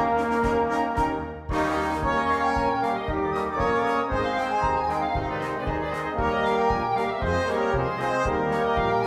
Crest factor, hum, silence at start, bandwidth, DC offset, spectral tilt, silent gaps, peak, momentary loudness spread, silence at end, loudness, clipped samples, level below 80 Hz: 14 dB; none; 0 s; 14 kHz; under 0.1%; -6 dB/octave; none; -10 dBFS; 5 LU; 0 s; -25 LUFS; under 0.1%; -38 dBFS